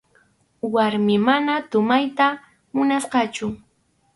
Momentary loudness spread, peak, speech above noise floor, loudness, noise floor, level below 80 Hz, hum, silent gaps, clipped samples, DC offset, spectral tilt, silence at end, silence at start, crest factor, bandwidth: 12 LU; -6 dBFS; 45 dB; -21 LUFS; -64 dBFS; -62 dBFS; none; none; under 0.1%; under 0.1%; -5 dB/octave; 0.6 s; 0.65 s; 16 dB; 11.5 kHz